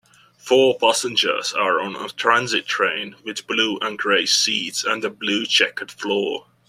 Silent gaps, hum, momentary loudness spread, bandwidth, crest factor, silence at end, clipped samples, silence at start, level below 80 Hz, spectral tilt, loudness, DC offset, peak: none; none; 10 LU; 14.5 kHz; 20 dB; 0.3 s; under 0.1%; 0.45 s; -68 dBFS; -1.5 dB/octave; -19 LUFS; under 0.1%; -2 dBFS